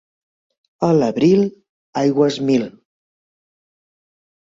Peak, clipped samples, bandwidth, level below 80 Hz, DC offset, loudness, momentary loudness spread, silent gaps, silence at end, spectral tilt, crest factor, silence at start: -4 dBFS; under 0.1%; 7.8 kHz; -60 dBFS; under 0.1%; -17 LUFS; 9 LU; 1.69-1.93 s; 1.8 s; -7 dB/octave; 16 dB; 0.8 s